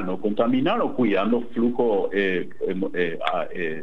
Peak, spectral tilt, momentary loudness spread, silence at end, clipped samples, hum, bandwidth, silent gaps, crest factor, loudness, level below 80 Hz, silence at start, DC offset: -6 dBFS; -8 dB/octave; 6 LU; 0 s; under 0.1%; none; 5.6 kHz; none; 16 dB; -24 LUFS; -60 dBFS; 0 s; 3%